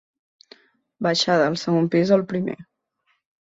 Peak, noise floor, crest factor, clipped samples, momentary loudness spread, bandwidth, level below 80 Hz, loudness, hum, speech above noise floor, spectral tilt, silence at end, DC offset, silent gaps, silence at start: -4 dBFS; -70 dBFS; 18 dB; under 0.1%; 9 LU; 8 kHz; -64 dBFS; -21 LUFS; none; 50 dB; -5.5 dB/octave; 0.75 s; under 0.1%; none; 1 s